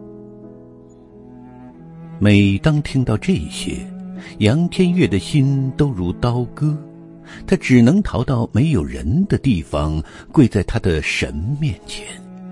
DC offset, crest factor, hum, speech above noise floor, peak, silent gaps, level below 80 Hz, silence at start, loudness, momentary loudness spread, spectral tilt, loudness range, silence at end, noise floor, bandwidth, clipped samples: under 0.1%; 18 dB; none; 25 dB; 0 dBFS; none; -36 dBFS; 0 s; -18 LUFS; 18 LU; -7 dB/octave; 2 LU; 0 s; -42 dBFS; 11.5 kHz; under 0.1%